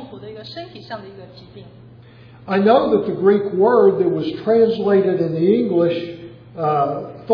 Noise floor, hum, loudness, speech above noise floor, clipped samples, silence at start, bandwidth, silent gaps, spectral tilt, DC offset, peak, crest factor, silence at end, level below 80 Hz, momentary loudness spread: -43 dBFS; none; -17 LUFS; 26 dB; under 0.1%; 0 s; 5.4 kHz; none; -9.5 dB/octave; under 0.1%; -2 dBFS; 16 dB; 0 s; -58 dBFS; 19 LU